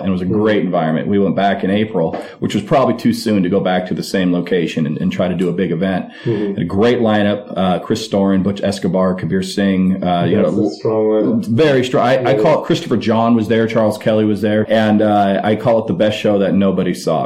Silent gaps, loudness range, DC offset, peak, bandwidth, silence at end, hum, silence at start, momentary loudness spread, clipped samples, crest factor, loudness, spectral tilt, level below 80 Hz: none; 3 LU; under 0.1%; -2 dBFS; 14.5 kHz; 0 s; none; 0 s; 5 LU; under 0.1%; 12 dB; -15 LUFS; -7 dB/octave; -52 dBFS